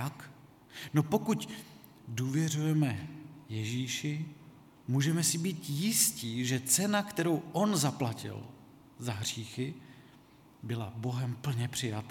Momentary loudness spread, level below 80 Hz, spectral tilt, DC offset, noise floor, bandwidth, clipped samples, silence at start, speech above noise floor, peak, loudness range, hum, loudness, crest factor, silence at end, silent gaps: 19 LU; -70 dBFS; -4.5 dB/octave; under 0.1%; -58 dBFS; 18.5 kHz; under 0.1%; 0 s; 26 dB; -12 dBFS; 8 LU; none; -32 LUFS; 22 dB; 0 s; none